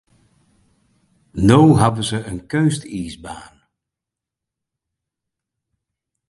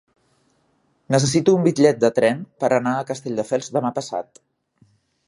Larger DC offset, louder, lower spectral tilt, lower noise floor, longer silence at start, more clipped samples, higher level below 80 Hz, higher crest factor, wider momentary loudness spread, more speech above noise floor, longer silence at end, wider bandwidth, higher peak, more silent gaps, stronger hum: neither; first, -16 LUFS vs -20 LUFS; about the same, -6.5 dB/octave vs -5.5 dB/octave; first, -85 dBFS vs -65 dBFS; first, 1.35 s vs 1.1 s; neither; first, -44 dBFS vs -62 dBFS; about the same, 20 dB vs 20 dB; first, 22 LU vs 11 LU; first, 69 dB vs 45 dB; first, 2.9 s vs 1.05 s; about the same, 11.5 kHz vs 11.5 kHz; about the same, 0 dBFS vs -2 dBFS; neither; neither